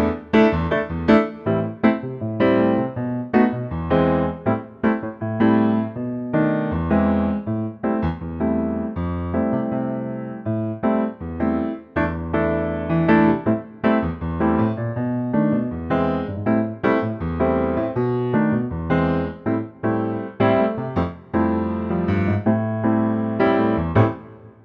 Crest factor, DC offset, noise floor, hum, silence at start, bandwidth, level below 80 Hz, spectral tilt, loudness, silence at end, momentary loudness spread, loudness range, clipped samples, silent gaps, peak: 18 dB; under 0.1%; -40 dBFS; none; 0 s; 5.4 kHz; -40 dBFS; -10 dB/octave; -21 LUFS; 0.15 s; 8 LU; 4 LU; under 0.1%; none; -4 dBFS